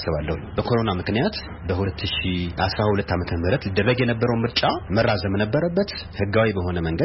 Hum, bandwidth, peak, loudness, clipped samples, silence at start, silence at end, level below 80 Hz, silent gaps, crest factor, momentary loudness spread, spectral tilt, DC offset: none; 5.8 kHz; -6 dBFS; -23 LUFS; under 0.1%; 0 s; 0 s; -38 dBFS; none; 16 dB; 5 LU; -10 dB/octave; under 0.1%